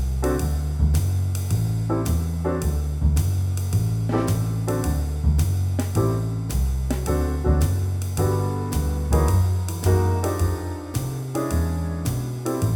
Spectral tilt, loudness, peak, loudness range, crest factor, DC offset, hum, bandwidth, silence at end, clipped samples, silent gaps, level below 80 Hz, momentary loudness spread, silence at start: -7 dB/octave; -23 LUFS; -6 dBFS; 1 LU; 14 dB; under 0.1%; none; 18 kHz; 0 s; under 0.1%; none; -28 dBFS; 5 LU; 0 s